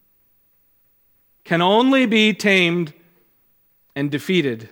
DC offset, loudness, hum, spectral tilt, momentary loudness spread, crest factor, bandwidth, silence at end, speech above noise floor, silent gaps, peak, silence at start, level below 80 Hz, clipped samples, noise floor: under 0.1%; -17 LUFS; none; -5.5 dB/octave; 11 LU; 18 dB; 18 kHz; 0.05 s; 43 dB; none; -2 dBFS; 1.45 s; -70 dBFS; under 0.1%; -61 dBFS